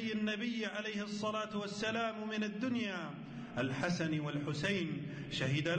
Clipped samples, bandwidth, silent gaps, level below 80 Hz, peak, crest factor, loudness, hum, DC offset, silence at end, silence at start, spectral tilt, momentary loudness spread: under 0.1%; 9.2 kHz; none; -68 dBFS; -26 dBFS; 12 dB; -38 LUFS; none; under 0.1%; 0 s; 0 s; -5.5 dB/octave; 5 LU